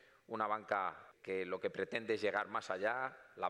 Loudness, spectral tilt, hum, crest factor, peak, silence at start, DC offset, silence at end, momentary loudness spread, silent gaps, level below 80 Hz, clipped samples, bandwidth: -39 LUFS; -4.5 dB/octave; none; 18 dB; -22 dBFS; 0.3 s; under 0.1%; 0 s; 7 LU; none; -84 dBFS; under 0.1%; 11.5 kHz